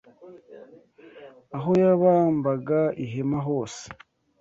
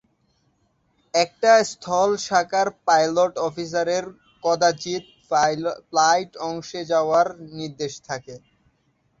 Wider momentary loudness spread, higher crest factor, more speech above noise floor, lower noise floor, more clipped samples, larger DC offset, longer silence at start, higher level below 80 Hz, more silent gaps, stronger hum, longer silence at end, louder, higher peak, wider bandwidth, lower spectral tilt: first, 18 LU vs 13 LU; about the same, 18 dB vs 20 dB; second, 28 dB vs 45 dB; second, -51 dBFS vs -67 dBFS; neither; neither; second, 0.2 s vs 1.15 s; about the same, -64 dBFS vs -64 dBFS; neither; neither; second, 0.45 s vs 0.8 s; about the same, -23 LUFS vs -22 LUFS; second, -8 dBFS vs -4 dBFS; about the same, 8 kHz vs 8 kHz; first, -8 dB/octave vs -3 dB/octave